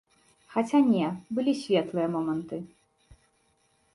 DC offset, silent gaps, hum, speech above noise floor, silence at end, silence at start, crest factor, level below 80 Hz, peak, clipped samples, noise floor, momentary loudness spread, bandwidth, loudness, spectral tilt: under 0.1%; none; none; 43 dB; 1.3 s; 0.5 s; 16 dB; -68 dBFS; -12 dBFS; under 0.1%; -69 dBFS; 14 LU; 11.5 kHz; -27 LUFS; -6.5 dB/octave